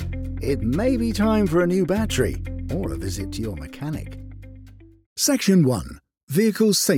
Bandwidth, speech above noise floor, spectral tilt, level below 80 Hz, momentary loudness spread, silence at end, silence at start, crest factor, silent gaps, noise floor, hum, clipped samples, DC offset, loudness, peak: 17.5 kHz; 24 dB; -5 dB/octave; -38 dBFS; 15 LU; 0 s; 0 s; 16 dB; 5.06-5.16 s, 6.23-6.27 s; -45 dBFS; none; under 0.1%; under 0.1%; -22 LUFS; -6 dBFS